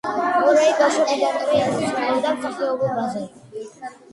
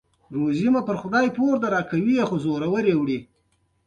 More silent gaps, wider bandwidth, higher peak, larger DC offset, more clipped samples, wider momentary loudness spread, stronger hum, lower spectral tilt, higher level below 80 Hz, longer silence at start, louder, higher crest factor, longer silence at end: neither; first, 11.5 kHz vs 9 kHz; first, -4 dBFS vs -8 dBFS; neither; neither; first, 19 LU vs 6 LU; neither; second, -4.5 dB/octave vs -7.5 dB/octave; about the same, -62 dBFS vs -60 dBFS; second, 0.05 s vs 0.3 s; first, -20 LUFS vs -23 LUFS; about the same, 16 dB vs 16 dB; second, 0.2 s vs 0.65 s